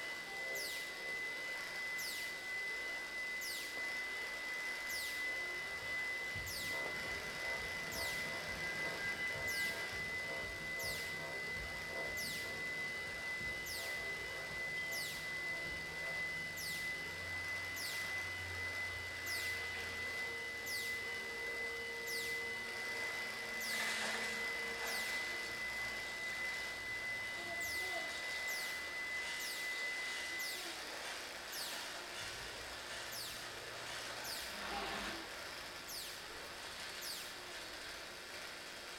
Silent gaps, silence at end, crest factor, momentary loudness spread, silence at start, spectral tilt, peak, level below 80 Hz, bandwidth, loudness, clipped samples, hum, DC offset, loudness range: none; 0 s; 16 dB; 6 LU; 0 s; -1.5 dB/octave; -26 dBFS; -66 dBFS; 19 kHz; -41 LUFS; under 0.1%; none; under 0.1%; 5 LU